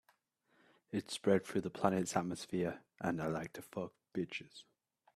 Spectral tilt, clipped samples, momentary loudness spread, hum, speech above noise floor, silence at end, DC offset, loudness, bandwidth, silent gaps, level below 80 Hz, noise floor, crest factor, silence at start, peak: -5.5 dB/octave; under 0.1%; 12 LU; none; 39 dB; 0.55 s; under 0.1%; -39 LUFS; 14 kHz; none; -74 dBFS; -76 dBFS; 26 dB; 0.9 s; -14 dBFS